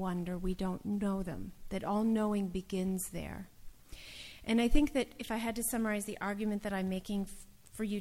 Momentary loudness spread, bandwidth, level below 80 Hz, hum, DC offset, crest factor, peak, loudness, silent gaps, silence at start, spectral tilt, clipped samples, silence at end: 16 LU; 16.5 kHz; -44 dBFS; none; under 0.1%; 22 dB; -14 dBFS; -35 LUFS; none; 0 s; -5.5 dB/octave; under 0.1%; 0 s